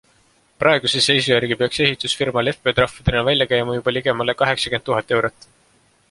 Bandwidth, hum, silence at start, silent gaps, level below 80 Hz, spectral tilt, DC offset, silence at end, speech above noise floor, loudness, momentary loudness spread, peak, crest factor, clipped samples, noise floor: 11.5 kHz; none; 0.6 s; none; -42 dBFS; -4 dB/octave; under 0.1%; 0.8 s; 39 dB; -18 LUFS; 5 LU; 0 dBFS; 18 dB; under 0.1%; -58 dBFS